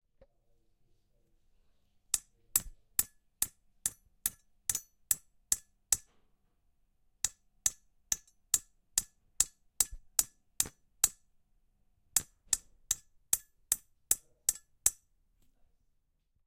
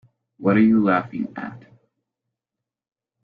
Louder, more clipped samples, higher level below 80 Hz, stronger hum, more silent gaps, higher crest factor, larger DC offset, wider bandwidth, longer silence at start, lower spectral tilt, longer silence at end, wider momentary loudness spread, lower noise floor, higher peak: second, -34 LUFS vs -20 LUFS; neither; about the same, -60 dBFS vs -62 dBFS; neither; neither; first, 30 dB vs 18 dB; neither; first, 16.5 kHz vs 4.7 kHz; first, 2.15 s vs 0.4 s; second, 1.5 dB/octave vs -10 dB/octave; about the same, 1.55 s vs 1.65 s; second, 6 LU vs 17 LU; second, -75 dBFS vs -86 dBFS; about the same, -8 dBFS vs -6 dBFS